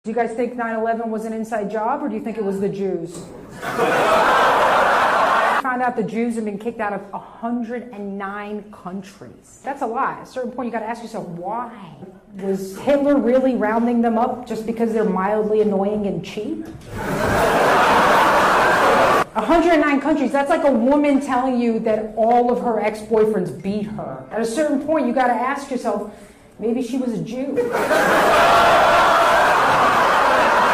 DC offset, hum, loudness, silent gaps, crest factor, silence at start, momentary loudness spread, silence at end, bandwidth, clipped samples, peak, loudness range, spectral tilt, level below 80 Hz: under 0.1%; none; -18 LUFS; none; 12 dB; 0.05 s; 15 LU; 0 s; 16 kHz; under 0.1%; -6 dBFS; 12 LU; -5 dB/octave; -48 dBFS